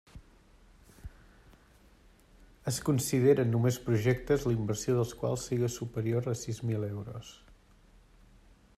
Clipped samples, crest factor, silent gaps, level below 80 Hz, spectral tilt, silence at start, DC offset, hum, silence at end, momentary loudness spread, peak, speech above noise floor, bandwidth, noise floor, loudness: under 0.1%; 18 dB; none; -56 dBFS; -6 dB/octave; 0.15 s; under 0.1%; none; 1.45 s; 19 LU; -14 dBFS; 31 dB; 14.5 kHz; -60 dBFS; -31 LUFS